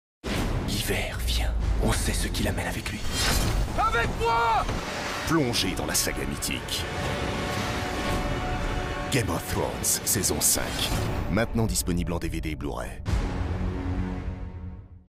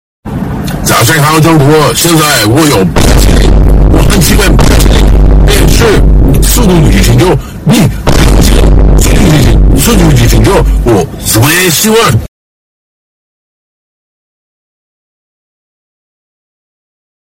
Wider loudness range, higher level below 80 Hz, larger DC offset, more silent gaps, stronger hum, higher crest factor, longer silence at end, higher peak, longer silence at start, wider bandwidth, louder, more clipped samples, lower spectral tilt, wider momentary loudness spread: about the same, 4 LU vs 4 LU; second, -32 dBFS vs -10 dBFS; neither; neither; neither; first, 18 dB vs 6 dB; second, 0.15 s vs 4.95 s; second, -10 dBFS vs 0 dBFS; about the same, 0.25 s vs 0.25 s; about the same, 16 kHz vs 17 kHz; second, -27 LUFS vs -6 LUFS; second, under 0.1% vs 0.5%; second, -3.5 dB/octave vs -5 dB/octave; first, 8 LU vs 4 LU